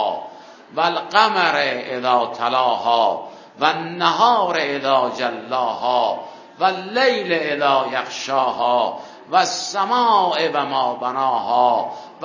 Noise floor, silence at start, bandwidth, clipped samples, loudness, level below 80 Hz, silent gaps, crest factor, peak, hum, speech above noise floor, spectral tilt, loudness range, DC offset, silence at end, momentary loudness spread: -40 dBFS; 0 s; 7.4 kHz; under 0.1%; -19 LUFS; -72 dBFS; none; 20 dB; 0 dBFS; none; 21 dB; -3 dB/octave; 1 LU; under 0.1%; 0 s; 8 LU